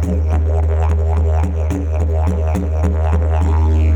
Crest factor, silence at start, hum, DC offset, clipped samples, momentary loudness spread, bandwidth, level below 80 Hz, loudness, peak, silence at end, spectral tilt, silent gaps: 12 dB; 0 s; none; under 0.1%; under 0.1%; 3 LU; 7.6 kHz; -16 dBFS; -17 LUFS; -2 dBFS; 0 s; -9 dB/octave; none